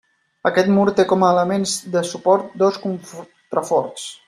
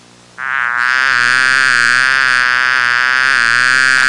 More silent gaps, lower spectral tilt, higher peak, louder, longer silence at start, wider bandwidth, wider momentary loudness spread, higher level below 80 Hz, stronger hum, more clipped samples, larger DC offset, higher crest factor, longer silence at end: neither; first, -5 dB/octave vs 0 dB/octave; about the same, -2 dBFS vs -2 dBFS; second, -18 LUFS vs -10 LUFS; about the same, 0.45 s vs 0.4 s; first, 14.5 kHz vs 11.5 kHz; first, 12 LU vs 5 LU; second, -62 dBFS vs -56 dBFS; neither; neither; neither; first, 16 dB vs 10 dB; about the same, 0.1 s vs 0 s